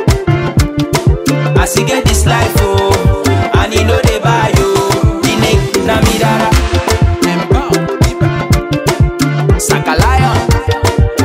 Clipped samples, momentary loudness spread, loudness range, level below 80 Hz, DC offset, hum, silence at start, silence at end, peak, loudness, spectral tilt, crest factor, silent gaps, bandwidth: under 0.1%; 3 LU; 1 LU; -18 dBFS; under 0.1%; none; 0 s; 0 s; 0 dBFS; -11 LUFS; -5 dB/octave; 10 dB; none; 16.5 kHz